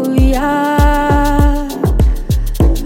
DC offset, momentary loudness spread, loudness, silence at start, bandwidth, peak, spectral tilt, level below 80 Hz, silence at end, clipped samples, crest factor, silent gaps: under 0.1%; 5 LU; -14 LUFS; 0 s; 17 kHz; 0 dBFS; -7 dB/octave; -14 dBFS; 0 s; under 0.1%; 10 dB; none